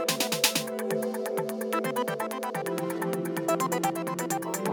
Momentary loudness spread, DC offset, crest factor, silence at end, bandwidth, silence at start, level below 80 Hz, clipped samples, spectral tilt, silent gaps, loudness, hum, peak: 7 LU; under 0.1%; 22 dB; 0 s; 19 kHz; 0 s; -86 dBFS; under 0.1%; -3.5 dB/octave; none; -29 LUFS; none; -6 dBFS